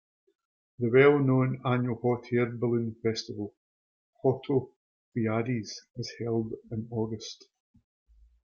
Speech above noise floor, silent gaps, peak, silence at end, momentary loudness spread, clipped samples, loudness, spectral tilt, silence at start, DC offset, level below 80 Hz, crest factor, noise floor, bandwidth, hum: over 62 dB; 3.57-4.13 s, 4.76-5.12 s; -8 dBFS; 1.1 s; 17 LU; under 0.1%; -29 LUFS; -7 dB/octave; 0.8 s; under 0.1%; -66 dBFS; 20 dB; under -90 dBFS; 7.2 kHz; none